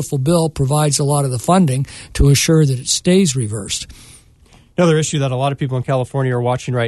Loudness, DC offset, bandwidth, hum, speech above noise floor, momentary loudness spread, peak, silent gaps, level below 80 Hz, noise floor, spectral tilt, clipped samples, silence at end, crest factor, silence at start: -16 LUFS; under 0.1%; 12.5 kHz; none; 32 dB; 9 LU; -2 dBFS; none; -32 dBFS; -48 dBFS; -5 dB/octave; under 0.1%; 0 s; 14 dB; 0 s